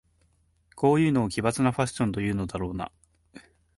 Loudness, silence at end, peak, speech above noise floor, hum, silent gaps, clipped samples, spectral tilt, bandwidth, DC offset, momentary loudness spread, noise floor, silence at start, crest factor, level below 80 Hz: -26 LUFS; 0.35 s; -10 dBFS; 41 dB; none; none; under 0.1%; -6.5 dB/octave; 11.5 kHz; under 0.1%; 11 LU; -66 dBFS; 0.75 s; 18 dB; -50 dBFS